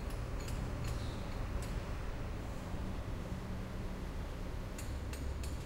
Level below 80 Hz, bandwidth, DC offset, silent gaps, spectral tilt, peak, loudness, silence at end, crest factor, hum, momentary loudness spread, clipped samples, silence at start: -42 dBFS; 16 kHz; under 0.1%; none; -6 dB/octave; -26 dBFS; -43 LUFS; 0 s; 14 dB; none; 3 LU; under 0.1%; 0 s